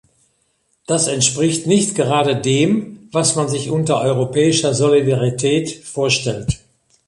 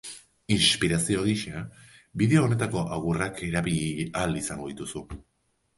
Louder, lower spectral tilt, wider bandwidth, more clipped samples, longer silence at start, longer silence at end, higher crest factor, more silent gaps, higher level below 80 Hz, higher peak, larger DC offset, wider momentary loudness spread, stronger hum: first, -17 LUFS vs -26 LUFS; about the same, -4.5 dB/octave vs -4.5 dB/octave; about the same, 11.5 kHz vs 11.5 kHz; neither; first, 0.9 s vs 0.05 s; about the same, 0.5 s vs 0.55 s; about the same, 18 dB vs 20 dB; neither; about the same, -44 dBFS vs -48 dBFS; first, 0 dBFS vs -8 dBFS; neither; second, 8 LU vs 19 LU; neither